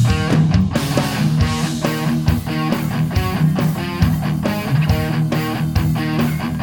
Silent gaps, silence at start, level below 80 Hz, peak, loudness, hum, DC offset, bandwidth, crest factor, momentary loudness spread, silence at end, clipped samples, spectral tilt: none; 0 s; -30 dBFS; -2 dBFS; -18 LUFS; none; under 0.1%; over 20 kHz; 16 dB; 4 LU; 0 s; under 0.1%; -6.5 dB/octave